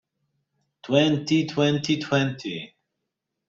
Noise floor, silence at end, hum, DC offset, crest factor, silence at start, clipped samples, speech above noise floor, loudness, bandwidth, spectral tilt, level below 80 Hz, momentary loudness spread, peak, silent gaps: -82 dBFS; 0.8 s; none; under 0.1%; 20 dB; 0.85 s; under 0.1%; 59 dB; -23 LUFS; 7.6 kHz; -5.5 dB/octave; -66 dBFS; 13 LU; -6 dBFS; none